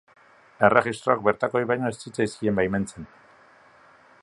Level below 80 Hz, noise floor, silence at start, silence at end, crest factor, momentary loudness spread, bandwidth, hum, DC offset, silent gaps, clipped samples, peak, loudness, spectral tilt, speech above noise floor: -56 dBFS; -54 dBFS; 0.6 s; 1.2 s; 24 dB; 12 LU; 11.5 kHz; none; under 0.1%; none; under 0.1%; -2 dBFS; -24 LUFS; -6 dB/octave; 31 dB